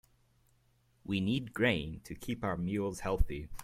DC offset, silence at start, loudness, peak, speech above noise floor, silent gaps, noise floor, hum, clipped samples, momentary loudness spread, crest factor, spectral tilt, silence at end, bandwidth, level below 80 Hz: under 0.1%; 1.05 s; -35 LUFS; -14 dBFS; 37 dB; none; -70 dBFS; none; under 0.1%; 11 LU; 20 dB; -6 dB/octave; 0 s; 16 kHz; -42 dBFS